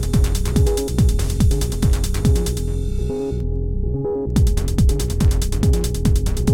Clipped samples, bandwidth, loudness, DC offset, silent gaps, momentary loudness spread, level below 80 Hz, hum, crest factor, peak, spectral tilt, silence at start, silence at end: under 0.1%; 17 kHz; -20 LUFS; under 0.1%; none; 5 LU; -20 dBFS; none; 14 dB; -2 dBFS; -6.5 dB/octave; 0 s; 0 s